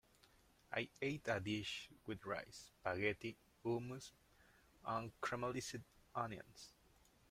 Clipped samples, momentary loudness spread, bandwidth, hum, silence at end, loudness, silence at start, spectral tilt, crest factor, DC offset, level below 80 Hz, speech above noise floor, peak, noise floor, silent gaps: under 0.1%; 13 LU; 16 kHz; none; 0.6 s; -45 LUFS; 0.7 s; -4.5 dB/octave; 24 dB; under 0.1%; -72 dBFS; 26 dB; -24 dBFS; -72 dBFS; none